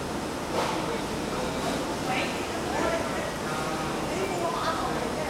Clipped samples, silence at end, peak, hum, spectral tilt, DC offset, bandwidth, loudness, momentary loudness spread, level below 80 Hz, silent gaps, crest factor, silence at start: under 0.1%; 0 s; -14 dBFS; none; -4 dB/octave; under 0.1%; 16 kHz; -29 LUFS; 3 LU; -48 dBFS; none; 16 dB; 0 s